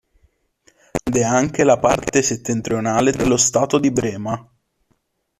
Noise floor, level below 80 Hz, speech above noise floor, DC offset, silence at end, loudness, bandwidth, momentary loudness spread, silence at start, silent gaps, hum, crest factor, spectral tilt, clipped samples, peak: -67 dBFS; -46 dBFS; 49 dB; under 0.1%; 1 s; -18 LUFS; 14 kHz; 11 LU; 0.95 s; none; none; 16 dB; -4.5 dB/octave; under 0.1%; -2 dBFS